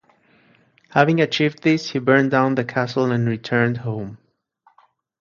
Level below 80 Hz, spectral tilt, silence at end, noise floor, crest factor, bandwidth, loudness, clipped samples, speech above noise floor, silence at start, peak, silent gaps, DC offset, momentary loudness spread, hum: -60 dBFS; -6.5 dB/octave; 1.05 s; -60 dBFS; 20 dB; 7.4 kHz; -19 LUFS; under 0.1%; 42 dB; 0.95 s; 0 dBFS; none; under 0.1%; 9 LU; none